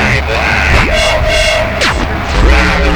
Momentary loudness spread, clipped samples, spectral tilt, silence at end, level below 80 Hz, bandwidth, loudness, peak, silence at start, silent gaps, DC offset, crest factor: 3 LU; under 0.1%; -4.5 dB/octave; 0 s; -14 dBFS; 19.5 kHz; -10 LUFS; 0 dBFS; 0 s; none; under 0.1%; 10 dB